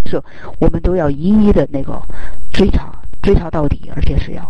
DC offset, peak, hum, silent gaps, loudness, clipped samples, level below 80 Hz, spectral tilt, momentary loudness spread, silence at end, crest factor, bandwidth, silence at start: under 0.1%; -2 dBFS; none; none; -16 LUFS; under 0.1%; -20 dBFS; -8.5 dB/octave; 17 LU; 0 s; 10 dB; 8.4 kHz; 0 s